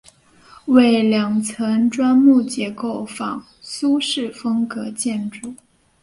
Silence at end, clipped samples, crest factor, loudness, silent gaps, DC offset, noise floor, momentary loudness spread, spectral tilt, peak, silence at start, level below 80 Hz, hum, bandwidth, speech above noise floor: 0.5 s; under 0.1%; 18 dB; -18 LUFS; none; under 0.1%; -49 dBFS; 16 LU; -4.5 dB/octave; -2 dBFS; 0.65 s; -60 dBFS; none; 11.5 kHz; 31 dB